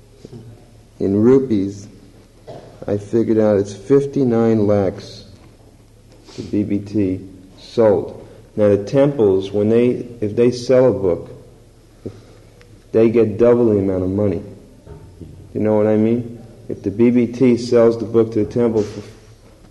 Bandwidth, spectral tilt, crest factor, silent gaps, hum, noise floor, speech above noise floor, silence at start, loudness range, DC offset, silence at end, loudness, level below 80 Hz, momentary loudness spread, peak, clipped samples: 11.5 kHz; -8 dB/octave; 14 dB; none; none; -46 dBFS; 30 dB; 0.3 s; 4 LU; under 0.1%; 0.6 s; -17 LUFS; -48 dBFS; 21 LU; -4 dBFS; under 0.1%